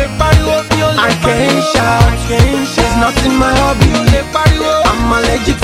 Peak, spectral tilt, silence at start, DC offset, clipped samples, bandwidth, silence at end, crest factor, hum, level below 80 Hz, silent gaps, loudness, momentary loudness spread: 0 dBFS; -5 dB/octave; 0 s; under 0.1%; 0.2%; 16 kHz; 0 s; 10 dB; none; -18 dBFS; none; -11 LUFS; 2 LU